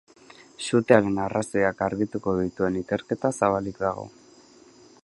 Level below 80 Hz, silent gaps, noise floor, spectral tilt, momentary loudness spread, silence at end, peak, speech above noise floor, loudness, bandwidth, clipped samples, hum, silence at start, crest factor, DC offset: -54 dBFS; none; -53 dBFS; -6 dB/octave; 9 LU; 0.95 s; -2 dBFS; 28 dB; -25 LUFS; 11.5 kHz; under 0.1%; none; 0.6 s; 24 dB; under 0.1%